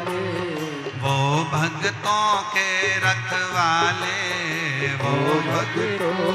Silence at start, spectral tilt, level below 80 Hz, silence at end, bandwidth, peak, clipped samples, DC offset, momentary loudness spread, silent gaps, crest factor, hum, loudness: 0 s; -4 dB/octave; -60 dBFS; 0 s; 15 kHz; -6 dBFS; under 0.1%; under 0.1%; 6 LU; none; 16 dB; none; -22 LUFS